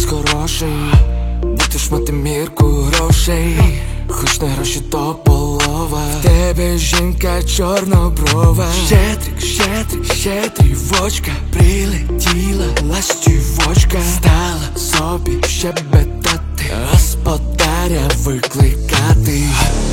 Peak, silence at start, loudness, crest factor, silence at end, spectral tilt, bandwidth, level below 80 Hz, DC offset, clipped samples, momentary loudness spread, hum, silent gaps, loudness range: 0 dBFS; 0 s; -14 LUFS; 14 dB; 0 s; -4.5 dB/octave; 17 kHz; -18 dBFS; under 0.1%; under 0.1%; 6 LU; none; none; 1 LU